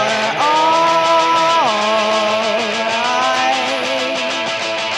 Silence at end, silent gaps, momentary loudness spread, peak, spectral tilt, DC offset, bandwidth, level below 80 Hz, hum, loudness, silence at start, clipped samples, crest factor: 0 s; none; 5 LU; -2 dBFS; -2 dB/octave; under 0.1%; 12.5 kHz; -64 dBFS; none; -15 LUFS; 0 s; under 0.1%; 12 dB